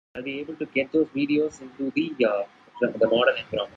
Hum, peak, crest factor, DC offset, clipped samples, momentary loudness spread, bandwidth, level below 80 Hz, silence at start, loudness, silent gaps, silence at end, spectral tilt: none; -8 dBFS; 18 dB; under 0.1%; under 0.1%; 11 LU; 7.8 kHz; -66 dBFS; 0.15 s; -25 LUFS; none; 0.1 s; -5.5 dB/octave